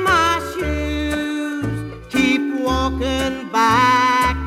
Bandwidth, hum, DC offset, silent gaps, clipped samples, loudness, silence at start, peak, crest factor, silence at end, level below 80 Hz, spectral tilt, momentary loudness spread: 16 kHz; none; under 0.1%; none; under 0.1%; -18 LUFS; 0 s; -2 dBFS; 16 dB; 0 s; -32 dBFS; -4.5 dB/octave; 9 LU